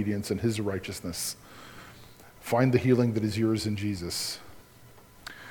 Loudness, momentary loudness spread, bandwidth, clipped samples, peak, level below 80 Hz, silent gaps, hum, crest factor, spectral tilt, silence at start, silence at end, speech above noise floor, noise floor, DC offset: -28 LUFS; 22 LU; 19 kHz; under 0.1%; -10 dBFS; -56 dBFS; none; none; 20 dB; -5.5 dB/octave; 0 s; 0 s; 26 dB; -54 dBFS; under 0.1%